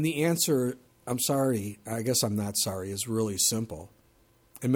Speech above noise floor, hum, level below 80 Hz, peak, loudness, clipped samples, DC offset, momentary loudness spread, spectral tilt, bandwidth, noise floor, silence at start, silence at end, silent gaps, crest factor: 35 dB; none; -64 dBFS; -10 dBFS; -28 LUFS; under 0.1%; under 0.1%; 10 LU; -4 dB/octave; 19 kHz; -63 dBFS; 0 s; 0 s; none; 18 dB